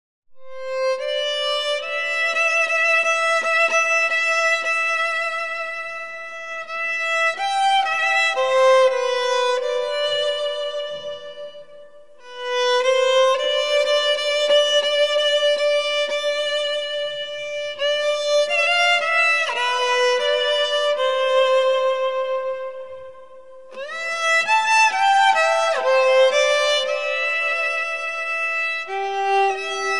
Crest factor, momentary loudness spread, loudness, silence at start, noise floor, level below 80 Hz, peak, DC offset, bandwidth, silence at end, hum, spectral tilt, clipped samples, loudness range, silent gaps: 16 dB; 12 LU; -19 LUFS; 0.25 s; -46 dBFS; -74 dBFS; -4 dBFS; 0.6%; 11.5 kHz; 0 s; none; 1 dB/octave; under 0.1%; 5 LU; none